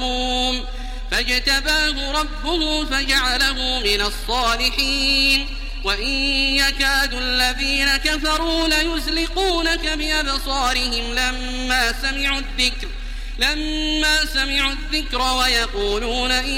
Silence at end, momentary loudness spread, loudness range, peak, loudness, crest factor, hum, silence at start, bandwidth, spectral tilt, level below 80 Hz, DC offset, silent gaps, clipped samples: 0 s; 6 LU; 2 LU; -4 dBFS; -19 LUFS; 16 dB; none; 0 s; 16.5 kHz; -2 dB/octave; -28 dBFS; under 0.1%; none; under 0.1%